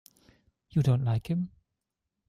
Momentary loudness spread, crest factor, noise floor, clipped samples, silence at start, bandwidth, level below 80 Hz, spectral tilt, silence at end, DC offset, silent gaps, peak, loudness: 7 LU; 16 dB; -86 dBFS; under 0.1%; 0.75 s; 12.5 kHz; -58 dBFS; -8.5 dB/octave; 0.8 s; under 0.1%; none; -16 dBFS; -29 LUFS